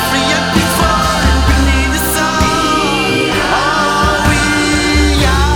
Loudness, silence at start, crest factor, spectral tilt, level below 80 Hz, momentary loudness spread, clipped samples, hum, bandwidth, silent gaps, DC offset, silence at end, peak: -12 LUFS; 0 s; 12 dB; -4 dB/octave; -18 dBFS; 1 LU; under 0.1%; none; over 20 kHz; none; under 0.1%; 0 s; 0 dBFS